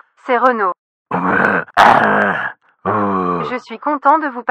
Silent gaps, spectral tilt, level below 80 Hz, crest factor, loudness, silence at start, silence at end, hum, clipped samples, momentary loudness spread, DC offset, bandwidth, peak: 0.79-1.05 s; -6 dB/octave; -56 dBFS; 16 dB; -15 LUFS; 0.25 s; 0 s; none; 0.3%; 13 LU; under 0.1%; 15.5 kHz; 0 dBFS